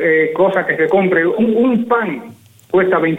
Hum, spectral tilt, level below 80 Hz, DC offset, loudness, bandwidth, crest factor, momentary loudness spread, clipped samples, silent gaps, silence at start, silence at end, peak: none; -8 dB/octave; -56 dBFS; under 0.1%; -14 LUFS; 8.6 kHz; 12 dB; 5 LU; under 0.1%; none; 0 s; 0 s; -2 dBFS